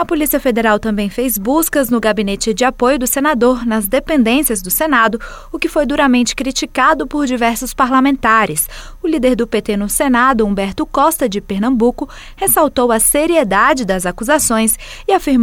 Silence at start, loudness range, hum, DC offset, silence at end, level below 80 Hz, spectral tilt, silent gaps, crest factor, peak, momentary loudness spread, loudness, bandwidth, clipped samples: 0 s; 1 LU; none; under 0.1%; 0 s; -34 dBFS; -3.5 dB/octave; none; 12 dB; -2 dBFS; 6 LU; -14 LUFS; 17.5 kHz; under 0.1%